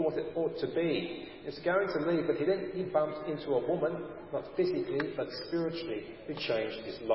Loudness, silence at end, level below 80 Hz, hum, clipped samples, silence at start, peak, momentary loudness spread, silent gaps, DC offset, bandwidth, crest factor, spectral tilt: -33 LUFS; 0 s; -66 dBFS; none; under 0.1%; 0 s; -14 dBFS; 9 LU; none; under 0.1%; 5.8 kHz; 18 dB; -9.5 dB/octave